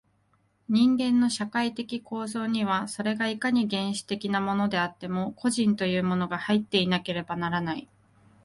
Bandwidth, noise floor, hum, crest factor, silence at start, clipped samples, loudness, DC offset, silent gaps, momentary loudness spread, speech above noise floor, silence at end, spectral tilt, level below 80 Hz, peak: 11.5 kHz; -68 dBFS; none; 16 dB; 0.7 s; under 0.1%; -27 LUFS; under 0.1%; none; 8 LU; 41 dB; 0.6 s; -5 dB/octave; -64 dBFS; -10 dBFS